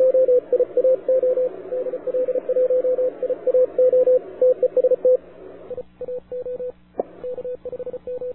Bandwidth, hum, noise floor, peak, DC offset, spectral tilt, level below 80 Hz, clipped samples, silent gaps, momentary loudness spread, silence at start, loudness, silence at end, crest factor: 2.8 kHz; none; -41 dBFS; -10 dBFS; 0.3%; -10.5 dB/octave; -60 dBFS; under 0.1%; none; 15 LU; 0 s; -21 LUFS; 0 s; 10 dB